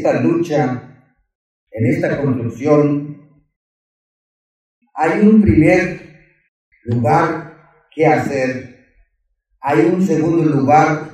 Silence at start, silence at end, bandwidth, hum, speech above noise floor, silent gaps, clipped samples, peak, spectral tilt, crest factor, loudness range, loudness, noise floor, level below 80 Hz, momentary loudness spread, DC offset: 0 s; 0 s; 12 kHz; none; 53 dB; 1.35-1.67 s, 3.56-4.81 s, 6.48-6.72 s; under 0.1%; 0 dBFS; -8 dB/octave; 16 dB; 4 LU; -15 LUFS; -67 dBFS; -42 dBFS; 17 LU; under 0.1%